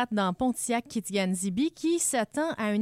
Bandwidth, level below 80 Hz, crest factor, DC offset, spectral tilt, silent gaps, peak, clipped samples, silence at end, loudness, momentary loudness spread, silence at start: 16 kHz; -62 dBFS; 14 dB; under 0.1%; -4 dB/octave; none; -14 dBFS; under 0.1%; 0 s; -28 LUFS; 4 LU; 0 s